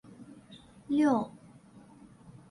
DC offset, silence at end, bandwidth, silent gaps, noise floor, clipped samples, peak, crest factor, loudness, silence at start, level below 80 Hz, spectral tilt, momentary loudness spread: under 0.1%; 1.2 s; 11.5 kHz; none; -55 dBFS; under 0.1%; -14 dBFS; 20 dB; -29 LUFS; 0.2 s; -70 dBFS; -6.5 dB/octave; 26 LU